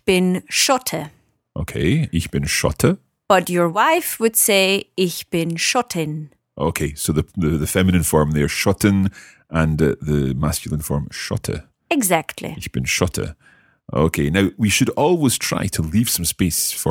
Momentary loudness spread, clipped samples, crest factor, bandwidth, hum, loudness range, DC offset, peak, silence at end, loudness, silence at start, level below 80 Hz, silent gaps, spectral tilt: 11 LU; under 0.1%; 18 dB; 18 kHz; none; 4 LU; under 0.1%; 0 dBFS; 0 s; -19 LUFS; 0.05 s; -38 dBFS; none; -4.5 dB/octave